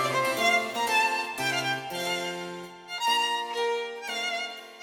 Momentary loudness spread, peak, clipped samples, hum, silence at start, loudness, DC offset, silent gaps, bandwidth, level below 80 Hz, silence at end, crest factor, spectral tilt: 12 LU; -12 dBFS; under 0.1%; none; 0 s; -27 LUFS; under 0.1%; none; 19.5 kHz; -74 dBFS; 0 s; 16 dB; -2 dB/octave